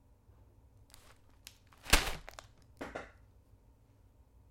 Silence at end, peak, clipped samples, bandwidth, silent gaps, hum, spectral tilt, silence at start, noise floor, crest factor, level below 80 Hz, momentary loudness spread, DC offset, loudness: 1.45 s; -10 dBFS; under 0.1%; 16.5 kHz; none; none; -2 dB/octave; 1.85 s; -64 dBFS; 32 dB; -44 dBFS; 29 LU; under 0.1%; -34 LUFS